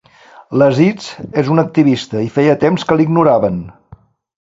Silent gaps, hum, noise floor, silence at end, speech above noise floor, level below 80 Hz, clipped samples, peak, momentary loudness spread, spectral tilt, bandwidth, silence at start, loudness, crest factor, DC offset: none; none; -43 dBFS; 0.7 s; 30 dB; -48 dBFS; under 0.1%; 0 dBFS; 9 LU; -7.5 dB/octave; 7.8 kHz; 0.4 s; -13 LUFS; 14 dB; under 0.1%